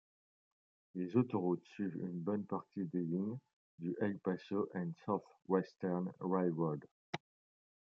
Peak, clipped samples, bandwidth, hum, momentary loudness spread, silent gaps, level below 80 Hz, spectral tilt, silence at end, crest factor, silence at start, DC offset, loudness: -18 dBFS; under 0.1%; 6.8 kHz; none; 11 LU; 3.53-3.78 s, 6.91-7.13 s; -86 dBFS; -9 dB/octave; 0.7 s; 20 dB; 0.95 s; under 0.1%; -40 LUFS